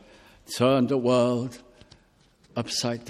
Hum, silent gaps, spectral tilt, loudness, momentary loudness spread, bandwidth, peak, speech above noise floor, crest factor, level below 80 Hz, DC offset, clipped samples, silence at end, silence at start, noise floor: none; none; -5 dB/octave; -25 LUFS; 14 LU; 14 kHz; -8 dBFS; 36 dB; 20 dB; -62 dBFS; under 0.1%; under 0.1%; 0 s; 0.5 s; -60 dBFS